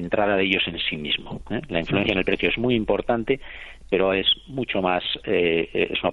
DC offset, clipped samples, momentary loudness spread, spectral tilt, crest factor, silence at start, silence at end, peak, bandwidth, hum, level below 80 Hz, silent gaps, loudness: under 0.1%; under 0.1%; 7 LU; -7 dB/octave; 20 dB; 0 s; 0 s; -4 dBFS; 7.4 kHz; none; -44 dBFS; none; -23 LUFS